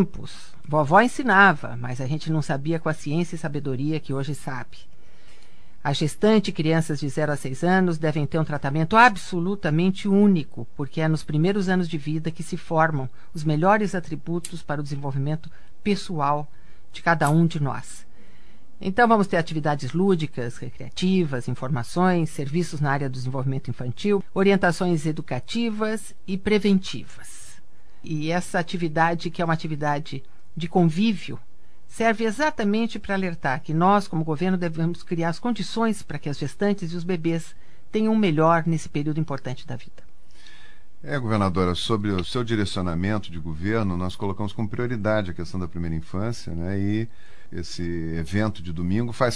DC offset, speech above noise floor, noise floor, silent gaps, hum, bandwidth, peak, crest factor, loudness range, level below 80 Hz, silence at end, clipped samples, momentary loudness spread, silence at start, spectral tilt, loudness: 3%; 29 dB; -53 dBFS; none; none; 11 kHz; -2 dBFS; 22 dB; 6 LU; -50 dBFS; 0 s; under 0.1%; 13 LU; 0 s; -6.5 dB/octave; -24 LUFS